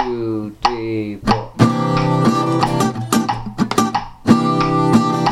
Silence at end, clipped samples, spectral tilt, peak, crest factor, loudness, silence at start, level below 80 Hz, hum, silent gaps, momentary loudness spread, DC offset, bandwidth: 0 s; under 0.1%; -6 dB/octave; 0 dBFS; 16 dB; -17 LUFS; 0 s; -40 dBFS; none; none; 7 LU; under 0.1%; 15.5 kHz